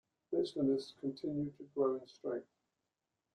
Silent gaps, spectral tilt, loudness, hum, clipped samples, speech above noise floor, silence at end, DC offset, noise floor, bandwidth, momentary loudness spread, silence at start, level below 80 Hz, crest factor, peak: none; -7.5 dB/octave; -39 LUFS; none; under 0.1%; 51 dB; 0.95 s; under 0.1%; -89 dBFS; 9.8 kHz; 8 LU; 0.3 s; -76 dBFS; 18 dB; -22 dBFS